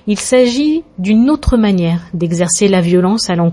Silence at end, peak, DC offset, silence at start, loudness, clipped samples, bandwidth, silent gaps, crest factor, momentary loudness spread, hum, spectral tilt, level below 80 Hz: 0 s; 0 dBFS; under 0.1%; 0.05 s; -13 LUFS; under 0.1%; 11.5 kHz; none; 12 dB; 6 LU; none; -5.5 dB/octave; -28 dBFS